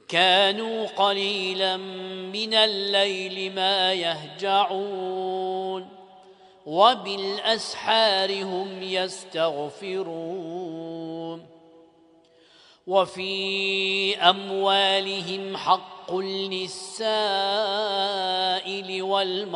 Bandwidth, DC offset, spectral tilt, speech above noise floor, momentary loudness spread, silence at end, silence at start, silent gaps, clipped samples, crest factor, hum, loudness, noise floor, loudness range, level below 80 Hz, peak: 10.5 kHz; under 0.1%; -3 dB/octave; 32 dB; 13 LU; 0 s; 0.1 s; none; under 0.1%; 22 dB; none; -24 LUFS; -57 dBFS; 8 LU; -78 dBFS; -2 dBFS